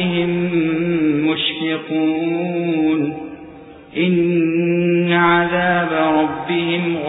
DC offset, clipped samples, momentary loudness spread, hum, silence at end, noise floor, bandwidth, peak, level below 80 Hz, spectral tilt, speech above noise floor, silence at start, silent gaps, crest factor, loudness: under 0.1%; under 0.1%; 6 LU; none; 0 s; -38 dBFS; 4 kHz; -4 dBFS; -54 dBFS; -11.5 dB/octave; 21 dB; 0 s; none; 14 dB; -17 LUFS